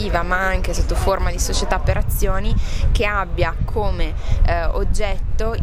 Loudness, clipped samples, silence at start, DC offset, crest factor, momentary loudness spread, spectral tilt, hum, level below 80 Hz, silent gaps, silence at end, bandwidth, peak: -21 LUFS; under 0.1%; 0 s; under 0.1%; 14 dB; 4 LU; -5 dB/octave; none; -20 dBFS; none; 0 s; 16 kHz; -4 dBFS